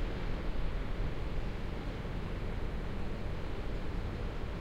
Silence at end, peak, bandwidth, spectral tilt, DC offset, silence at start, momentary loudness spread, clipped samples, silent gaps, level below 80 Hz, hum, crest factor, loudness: 0 s; -22 dBFS; 8.2 kHz; -7 dB/octave; under 0.1%; 0 s; 1 LU; under 0.1%; none; -38 dBFS; none; 14 dB; -40 LUFS